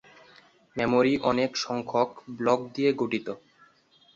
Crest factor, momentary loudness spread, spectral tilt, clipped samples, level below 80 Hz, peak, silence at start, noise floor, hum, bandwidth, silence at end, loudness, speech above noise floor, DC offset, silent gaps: 18 dB; 10 LU; -5 dB/octave; under 0.1%; -64 dBFS; -10 dBFS; 0.75 s; -61 dBFS; none; 7.6 kHz; 0.8 s; -26 LUFS; 35 dB; under 0.1%; none